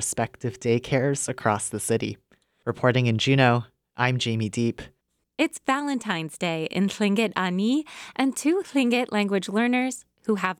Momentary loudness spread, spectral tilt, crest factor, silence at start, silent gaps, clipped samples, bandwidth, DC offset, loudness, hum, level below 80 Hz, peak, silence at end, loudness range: 8 LU; -5 dB/octave; 18 dB; 0 s; none; under 0.1%; 15.5 kHz; under 0.1%; -25 LUFS; none; -62 dBFS; -6 dBFS; 0.05 s; 2 LU